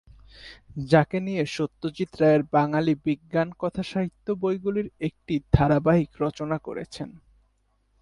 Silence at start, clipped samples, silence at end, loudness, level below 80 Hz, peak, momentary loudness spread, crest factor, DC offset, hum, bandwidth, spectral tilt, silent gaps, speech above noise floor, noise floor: 0.4 s; under 0.1%; 0.85 s; -25 LUFS; -44 dBFS; -2 dBFS; 15 LU; 24 dB; under 0.1%; none; 11.5 kHz; -7.5 dB/octave; none; 44 dB; -68 dBFS